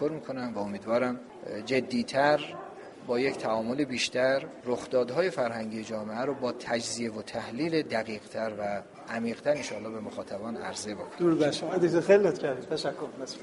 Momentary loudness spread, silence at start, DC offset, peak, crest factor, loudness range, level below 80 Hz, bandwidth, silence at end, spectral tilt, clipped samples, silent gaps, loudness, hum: 12 LU; 0 s; under 0.1%; -8 dBFS; 20 dB; 5 LU; -68 dBFS; 11.5 kHz; 0 s; -4.5 dB/octave; under 0.1%; none; -30 LUFS; none